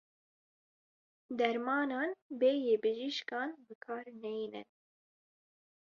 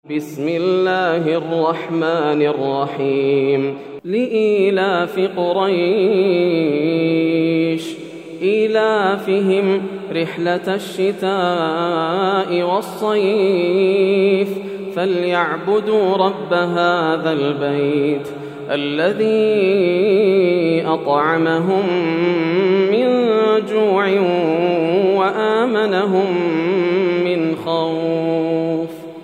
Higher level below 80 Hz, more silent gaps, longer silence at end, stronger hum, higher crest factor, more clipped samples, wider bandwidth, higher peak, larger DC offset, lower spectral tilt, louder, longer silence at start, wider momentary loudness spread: second, -86 dBFS vs -70 dBFS; first, 2.22-2.30 s, 3.75-3.81 s vs none; first, 1.3 s vs 0 s; neither; first, 22 dB vs 14 dB; neither; second, 7 kHz vs 14 kHz; second, -16 dBFS vs -2 dBFS; neither; second, -1.5 dB/octave vs -7 dB/octave; second, -35 LUFS vs -17 LUFS; first, 1.3 s vs 0.1 s; first, 13 LU vs 6 LU